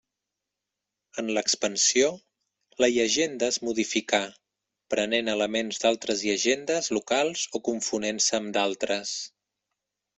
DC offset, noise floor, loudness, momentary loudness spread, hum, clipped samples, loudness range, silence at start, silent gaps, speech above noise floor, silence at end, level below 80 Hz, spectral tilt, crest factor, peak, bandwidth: under 0.1%; -86 dBFS; -26 LUFS; 8 LU; none; under 0.1%; 2 LU; 1.15 s; none; 60 dB; 0.9 s; -68 dBFS; -1.5 dB/octave; 20 dB; -6 dBFS; 8.4 kHz